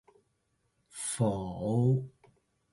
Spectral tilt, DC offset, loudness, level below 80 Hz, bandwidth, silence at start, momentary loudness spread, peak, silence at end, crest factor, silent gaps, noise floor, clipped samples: -6.5 dB/octave; under 0.1%; -31 LUFS; -60 dBFS; 11.5 kHz; 0.95 s; 17 LU; -16 dBFS; 0.65 s; 16 dB; none; -77 dBFS; under 0.1%